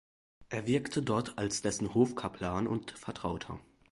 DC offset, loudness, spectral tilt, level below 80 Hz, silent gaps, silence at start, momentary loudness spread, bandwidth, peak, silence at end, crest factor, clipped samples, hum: under 0.1%; -34 LUFS; -5 dB/octave; -56 dBFS; none; 0.4 s; 11 LU; 11.5 kHz; -14 dBFS; 0.3 s; 20 dB; under 0.1%; none